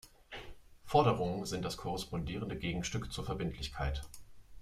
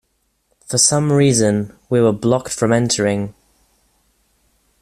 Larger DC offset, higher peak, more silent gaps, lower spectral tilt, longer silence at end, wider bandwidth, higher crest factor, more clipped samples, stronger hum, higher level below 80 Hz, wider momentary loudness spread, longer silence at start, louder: neither; second, -14 dBFS vs 0 dBFS; neither; about the same, -5.5 dB/octave vs -4.5 dB/octave; second, 0 s vs 1.5 s; about the same, 15.5 kHz vs 14.5 kHz; about the same, 22 dB vs 18 dB; neither; neither; about the same, -48 dBFS vs -52 dBFS; first, 19 LU vs 8 LU; second, 0.05 s vs 0.7 s; second, -36 LUFS vs -16 LUFS